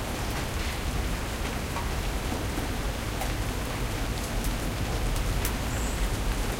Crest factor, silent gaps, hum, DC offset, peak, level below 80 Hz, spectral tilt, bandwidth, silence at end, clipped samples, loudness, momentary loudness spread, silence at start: 16 dB; none; none; under 0.1%; -12 dBFS; -32 dBFS; -4.5 dB/octave; 16.5 kHz; 0 s; under 0.1%; -31 LUFS; 2 LU; 0 s